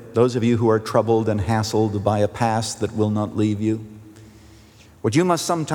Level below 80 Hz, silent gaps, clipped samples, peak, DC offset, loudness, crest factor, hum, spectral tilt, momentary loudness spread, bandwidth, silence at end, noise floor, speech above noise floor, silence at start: -54 dBFS; none; under 0.1%; -4 dBFS; under 0.1%; -21 LUFS; 18 dB; none; -6 dB/octave; 6 LU; 17.5 kHz; 0 s; -48 dBFS; 28 dB; 0 s